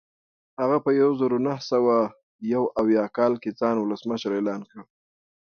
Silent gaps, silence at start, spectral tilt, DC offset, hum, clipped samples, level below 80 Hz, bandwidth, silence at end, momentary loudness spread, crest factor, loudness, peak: 2.23-2.39 s; 0.6 s; -7 dB/octave; under 0.1%; none; under 0.1%; -66 dBFS; 6.8 kHz; 0.65 s; 8 LU; 16 dB; -24 LUFS; -8 dBFS